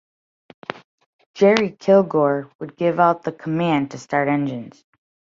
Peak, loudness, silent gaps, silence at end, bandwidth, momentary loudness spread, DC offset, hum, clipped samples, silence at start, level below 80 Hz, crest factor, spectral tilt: -2 dBFS; -19 LUFS; 2.55-2.59 s; 0.6 s; 7.6 kHz; 18 LU; under 0.1%; none; under 0.1%; 1.35 s; -66 dBFS; 20 dB; -7 dB/octave